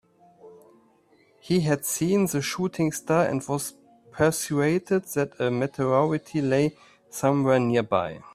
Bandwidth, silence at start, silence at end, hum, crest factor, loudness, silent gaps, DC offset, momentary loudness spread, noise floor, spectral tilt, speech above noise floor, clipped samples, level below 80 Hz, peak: 16 kHz; 0.45 s; 0.15 s; none; 18 dB; -25 LUFS; none; under 0.1%; 6 LU; -61 dBFS; -5.5 dB/octave; 37 dB; under 0.1%; -60 dBFS; -6 dBFS